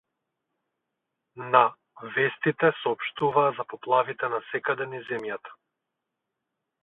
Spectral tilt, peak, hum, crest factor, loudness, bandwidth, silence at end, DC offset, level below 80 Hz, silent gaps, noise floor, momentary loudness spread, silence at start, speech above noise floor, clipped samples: -8 dB/octave; -2 dBFS; none; 26 dB; -26 LUFS; 4.1 kHz; 1.3 s; under 0.1%; -76 dBFS; none; -84 dBFS; 13 LU; 1.35 s; 58 dB; under 0.1%